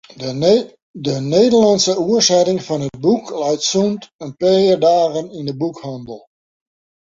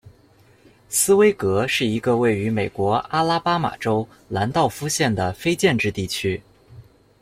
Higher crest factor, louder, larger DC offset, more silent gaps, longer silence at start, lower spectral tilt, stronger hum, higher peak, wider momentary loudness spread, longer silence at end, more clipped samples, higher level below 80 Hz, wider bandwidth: about the same, 16 dB vs 16 dB; first, -16 LUFS vs -21 LUFS; neither; first, 0.82-0.94 s, 4.13-4.19 s vs none; about the same, 0.15 s vs 0.05 s; about the same, -4.5 dB/octave vs -4.5 dB/octave; neither; about the same, -2 dBFS vs -4 dBFS; first, 16 LU vs 7 LU; first, 0.9 s vs 0.4 s; neither; second, -58 dBFS vs -52 dBFS; second, 7.8 kHz vs 16 kHz